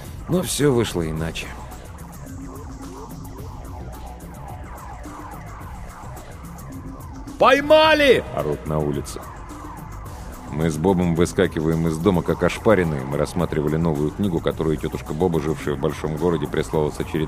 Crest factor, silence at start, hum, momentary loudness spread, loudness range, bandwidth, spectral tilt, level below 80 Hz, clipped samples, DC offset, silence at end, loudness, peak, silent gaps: 20 dB; 0 s; none; 19 LU; 17 LU; 15.5 kHz; -5.5 dB/octave; -38 dBFS; under 0.1%; under 0.1%; 0 s; -20 LUFS; -4 dBFS; none